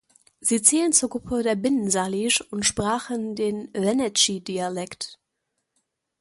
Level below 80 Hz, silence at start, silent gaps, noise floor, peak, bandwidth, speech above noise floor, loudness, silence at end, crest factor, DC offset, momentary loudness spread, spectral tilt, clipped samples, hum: -56 dBFS; 0.4 s; none; -79 dBFS; -2 dBFS; 12 kHz; 55 dB; -22 LUFS; 1.05 s; 24 dB; under 0.1%; 12 LU; -2.5 dB/octave; under 0.1%; none